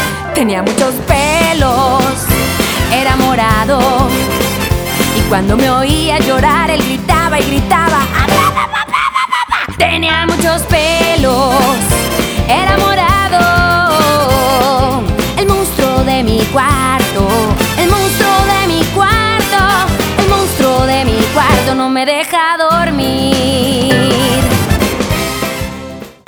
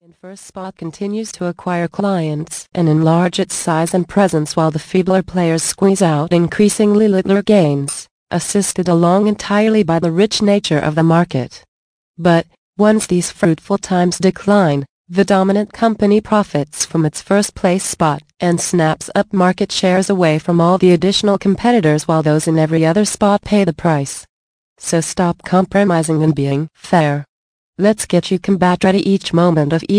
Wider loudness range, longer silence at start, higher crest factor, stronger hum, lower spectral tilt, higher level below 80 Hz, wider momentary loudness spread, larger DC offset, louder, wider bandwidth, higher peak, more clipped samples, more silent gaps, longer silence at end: about the same, 1 LU vs 3 LU; second, 0 s vs 0.25 s; about the same, 10 dB vs 14 dB; neither; about the same, -4.5 dB/octave vs -5.5 dB/octave; first, -24 dBFS vs -48 dBFS; second, 4 LU vs 9 LU; neither; first, -11 LUFS vs -15 LUFS; first, over 20 kHz vs 10.5 kHz; about the same, 0 dBFS vs -2 dBFS; neither; second, none vs 8.11-8.27 s, 11.68-12.14 s, 12.58-12.73 s, 14.89-15.05 s, 24.29-24.76 s, 27.28-27.73 s; first, 0.15 s vs 0 s